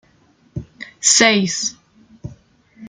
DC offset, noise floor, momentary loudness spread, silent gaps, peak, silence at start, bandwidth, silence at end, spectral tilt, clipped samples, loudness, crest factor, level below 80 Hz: under 0.1%; -55 dBFS; 26 LU; none; -2 dBFS; 0.55 s; 11 kHz; 0 s; -2 dB/octave; under 0.1%; -14 LUFS; 20 dB; -52 dBFS